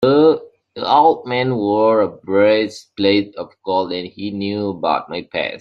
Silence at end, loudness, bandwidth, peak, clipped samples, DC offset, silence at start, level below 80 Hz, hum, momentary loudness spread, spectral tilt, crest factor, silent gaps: 0 s; -17 LUFS; 8 kHz; -2 dBFS; under 0.1%; under 0.1%; 0 s; -60 dBFS; none; 12 LU; -6.5 dB/octave; 16 dB; none